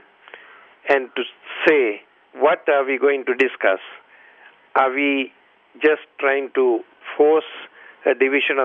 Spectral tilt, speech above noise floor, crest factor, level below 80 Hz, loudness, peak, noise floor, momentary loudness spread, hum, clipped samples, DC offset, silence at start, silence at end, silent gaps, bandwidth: -5 dB/octave; 31 dB; 18 dB; -72 dBFS; -19 LUFS; -2 dBFS; -50 dBFS; 13 LU; none; under 0.1%; under 0.1%; 0.35 s; 0 s; none; 5.8 kHz